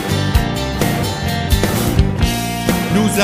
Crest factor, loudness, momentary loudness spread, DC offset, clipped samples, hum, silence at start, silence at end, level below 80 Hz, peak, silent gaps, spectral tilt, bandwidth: 16 dB; -17 LUFS; 3 LU; under 0.1%; under 0.1%; none; 0 s; 0 s; -22 dBFS; 0 dBFS; none; -5 dB/octave; 15.5 kHz